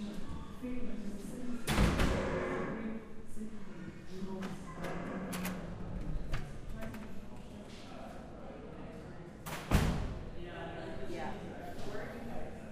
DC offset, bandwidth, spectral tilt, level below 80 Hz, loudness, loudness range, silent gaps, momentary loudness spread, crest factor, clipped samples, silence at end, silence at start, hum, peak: under 0.1%; 15.5 kHz; -5.5 dB/octave; -44 dBFS; -40 LUFS; 9 LU; none; 16 LU; 22 dB; under 0.1%; 0 s; 0 s; none; -16 dBFS